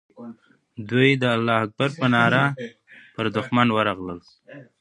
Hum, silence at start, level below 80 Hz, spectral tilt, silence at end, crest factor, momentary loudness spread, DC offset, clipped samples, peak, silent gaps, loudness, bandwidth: none; 0.2 s; -60 dBFS; -6.5 dB/octave; 0.2 s; 22 dB; 22 LU; under 0.1%; under 0.1%; -2 dBFS; none; -21 LUFS; 10.5 kHz